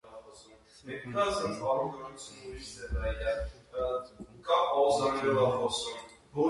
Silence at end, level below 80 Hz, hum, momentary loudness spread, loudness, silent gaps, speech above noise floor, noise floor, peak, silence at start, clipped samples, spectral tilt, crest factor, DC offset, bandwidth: 0 s; -46 dBFS; none; 18 LU; -31 LUFS; none; 25 dB; -56 dBFS; -14 dBFS; 0.05 s; under 0.1%; -4.5 dB/octave; 18 dB; under 0.1%; 11.5 kHz